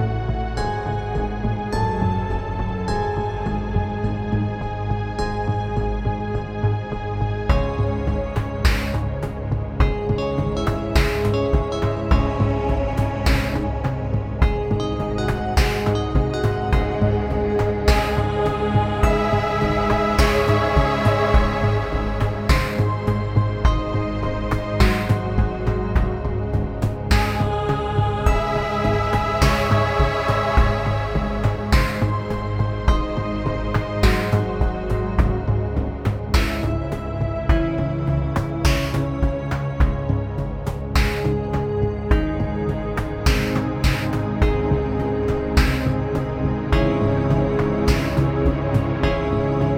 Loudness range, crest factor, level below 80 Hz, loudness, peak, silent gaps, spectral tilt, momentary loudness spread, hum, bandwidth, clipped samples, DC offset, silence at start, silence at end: 4 LU; 18 dB; -26 dBFS; -22 LUFS; -2 dBFS; none; -7 dB/octave; 6 LU; none; 16 kHz; under 0.1%; under 0.1%; 0 s; 0 s